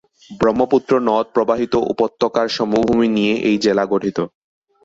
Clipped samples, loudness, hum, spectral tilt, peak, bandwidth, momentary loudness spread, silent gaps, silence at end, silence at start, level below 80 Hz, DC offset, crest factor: under 0.1%; -17 LUFS; none; -6 dB/octave; -2 dBFS; 7.8 kHz; 4 LU; none; 0.6 s; 0.3 s; -52 dBFS; under 0.1%; 14 dB